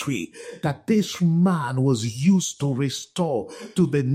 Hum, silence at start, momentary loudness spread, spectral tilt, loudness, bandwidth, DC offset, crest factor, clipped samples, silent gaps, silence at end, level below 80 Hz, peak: none; 0 s; 9 LU; -6 dB/octave; -23 LUFS; 14.5 kHz; under 0.1%; 14 dB; under 0.1%; none; 0 s; -62 dBFS; -8 dBFS